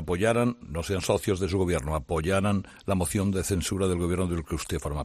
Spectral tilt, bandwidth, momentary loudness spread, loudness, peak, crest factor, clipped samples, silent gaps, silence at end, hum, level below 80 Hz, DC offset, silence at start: -5.5 dB/octave; 14 kHz; 6 LU; -27 LUFS; -10 dBFS; 18 dB; under 0.1%; none; 0 s; none; -44 dBFS; under 0.1%; 0 s